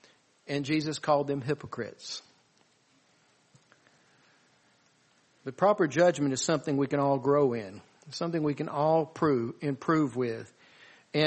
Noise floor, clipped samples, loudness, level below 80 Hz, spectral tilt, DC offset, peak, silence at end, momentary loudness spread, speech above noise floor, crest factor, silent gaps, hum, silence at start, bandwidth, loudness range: -67 dBFS; under 0.1%; -29 LUFS; -72 dBFS; -5.5 dB/octave; under 0.1%; -10 dBFS; 0 s; 16 LU; 39 dB; 20 dB; none; none; 0.5 s; 8.4 kHz; 13 LU